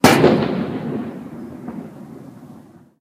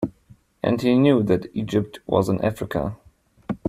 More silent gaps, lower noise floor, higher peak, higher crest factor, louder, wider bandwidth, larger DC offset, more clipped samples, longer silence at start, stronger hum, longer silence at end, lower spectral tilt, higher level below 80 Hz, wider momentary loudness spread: neither; second, -44 dBFS vs -54 dBFS; first, 0 dBFS vs -4 dBFS; about the same, 20 dB vs 18 dB; first, -18 LUFS vs -22 LUFS; about the same, 15.5 kHz vs 15 kHz; neither; neither; about the same, 0.05 s vs 0 s; neither; first, 0.4 s vs 0 s; second, -5 dB/octave vs -7.5 dB/octave; about the same, -52 dBFS vs -50 dBFS; first, 25 LU vs 14 LU